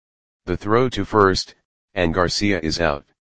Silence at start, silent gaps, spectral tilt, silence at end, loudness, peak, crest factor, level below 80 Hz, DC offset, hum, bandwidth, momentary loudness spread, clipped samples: 0.4 s; 1.65-1.88 s; -5 dB/octave; 0.2 s; -20 LUFS; 0 dBFS; 20 dB; -40 dBFS; 2%; none; 9.8 kHz; 14 LU; under 0.1%